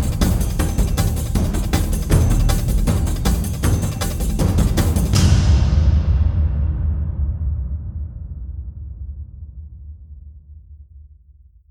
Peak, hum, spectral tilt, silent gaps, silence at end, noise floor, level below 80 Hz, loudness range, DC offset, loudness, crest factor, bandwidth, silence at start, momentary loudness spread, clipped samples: -2 dBFS; none; -6 dB/octave; none; 0.7 s; -48 dBFS; -20 dBFS; 17 LU; under 0.1%; -19 LUFS; 16 dB; 19 kHz; 0 s; 18 LU; under 0.1%